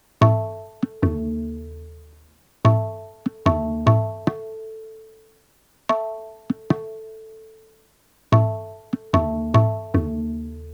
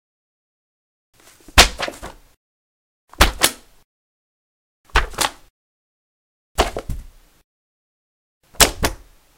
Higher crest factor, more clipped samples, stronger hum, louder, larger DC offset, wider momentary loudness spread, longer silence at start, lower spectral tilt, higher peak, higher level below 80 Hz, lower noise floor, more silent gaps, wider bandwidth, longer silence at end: about the same, 22 dB vs 24 dB; neither; neither; second, -23 LUFS vs -17 LUFS; neither; about the same, 19 LU vs 20 LU; second, 0.2 s vs 1.55 s; first, -8.5 dB/octave vs -2 dB/octave; about the same, -2 dBFS vs 0 dBFS; second, -42 dBFS vs -30 dBFS; first, -60 dBFS vs -37 dBFS; second, none vs 2.37-3.08 s, 3.84-4.84 s, 5.50-6.55 s, 7.44-8.41 s; second, 7 kHz vs 17 kHz; second, 0 s vs 0.4 s